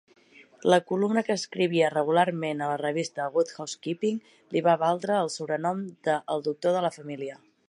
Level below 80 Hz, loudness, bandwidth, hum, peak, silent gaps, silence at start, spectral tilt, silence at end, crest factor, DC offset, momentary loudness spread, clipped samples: -80 dBFS; -27 LUFS; 11.5 kHz; none; -6 dBFS; none; 0.4 s; -5 dB/octave; 0.35 s; 20 dB; under 0.1%; 8 LU; under 0.1%